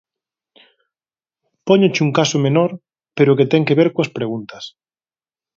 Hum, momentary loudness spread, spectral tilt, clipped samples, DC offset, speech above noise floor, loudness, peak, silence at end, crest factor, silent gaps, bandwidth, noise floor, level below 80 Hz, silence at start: none; 19 LU; -6 dB/octave; under 0.1%; under 0.1%; over 75 dB; -16 LUFS; 0 dBFS; 0.9 s; 18 dB; none; 7.6 kHz; under -90 dBFS; -62 dBFS; 1.65 s